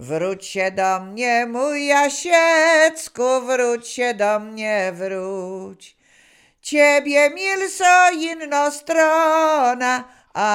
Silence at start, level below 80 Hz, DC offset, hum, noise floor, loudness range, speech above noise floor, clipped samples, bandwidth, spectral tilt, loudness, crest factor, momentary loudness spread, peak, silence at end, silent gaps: 0 s; -70 dBFS; under 0.1%; none; -54 dBFS; 6 LU; 36 dB; under 0.1%; 16.5 kHz; -2.5 dB/octave; -18 LUFS; 18 dB; 12 LU; -2 dBFS; 0 s; none